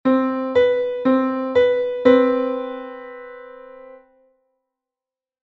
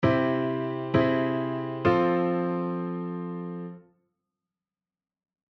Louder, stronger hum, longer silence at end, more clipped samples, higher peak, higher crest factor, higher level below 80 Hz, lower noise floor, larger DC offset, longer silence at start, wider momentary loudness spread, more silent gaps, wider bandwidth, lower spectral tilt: first, -18 LUFS vs -27 LUFS; neither; second, 1.55 s vs 1.7 s; neither; first, -2 dBFS vs -10 dBFS; about the same, 20 dB vs 18 dB; about the same, -58 dBFS vs -58 dBFS; about the same, under -90 dBFS vs under -90 dBFS; neither; about the same, 0.05 s vs 0 s; first, 21 LU vs 12 LU; neither; about the same, 6 kHz vs 6.2 kHz; second, -7 dB/octave vs -9 dB/octave